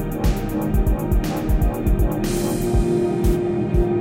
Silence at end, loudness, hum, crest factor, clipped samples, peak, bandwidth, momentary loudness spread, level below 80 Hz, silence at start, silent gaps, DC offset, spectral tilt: 0 s; -21 LUFS; none; 14 dB; under 0.1%; -6 dBFS; 16.5 kHz; 3 LU; -22 dBFS; 0 s; none; under 0.1%; -7 dB/octave